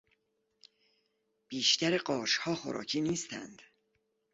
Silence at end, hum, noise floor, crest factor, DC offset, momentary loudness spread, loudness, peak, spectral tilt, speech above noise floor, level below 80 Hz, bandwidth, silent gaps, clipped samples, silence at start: 0.7 s; none; -79 dBFS; 22 dB; under 0.1%; 16 LU; -31 LUFS; -14 dBFS; -3 dB/octave; 46 dB; -74 dBFS; 8 kHz; none; under 0.1%; 1.5 s